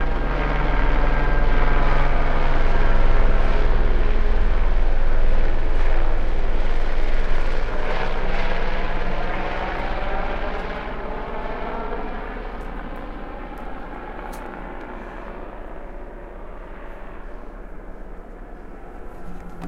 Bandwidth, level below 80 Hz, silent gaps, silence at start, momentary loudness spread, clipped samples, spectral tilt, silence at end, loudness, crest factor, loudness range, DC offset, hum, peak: 5.2 kHz; -20 dBFS; none; 0 s; 16 LU; under 0.1%; -7 dB/octave; 0 s; -26 LUFS; 14 dB; 15 LU; under 0.1%; none; -4 dBFS